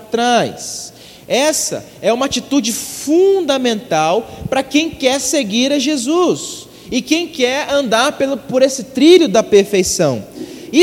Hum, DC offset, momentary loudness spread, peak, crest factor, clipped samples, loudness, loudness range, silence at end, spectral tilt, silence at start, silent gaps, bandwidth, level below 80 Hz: none; under 0.1%; 10 LU; 0 dBFS; 14 dB; under 0.1%; -15 LUFS; 3 LU; 0 s; -3.5 dB/octave; 0 s; none; 16.5 kHz; -48 dBFS